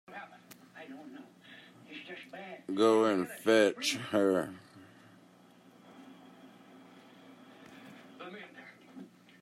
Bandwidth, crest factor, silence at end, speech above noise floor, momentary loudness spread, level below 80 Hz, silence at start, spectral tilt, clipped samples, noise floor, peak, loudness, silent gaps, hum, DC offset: 15.5 kHz; 22 dB; 0.35 s; 31 dB; 28 LU; -84 dBFS; 0.1 s; -4 dB/octave; under 0.1%; -60 dBFS; -14 dBFS; -29 LUFS; none; none; under 0.1%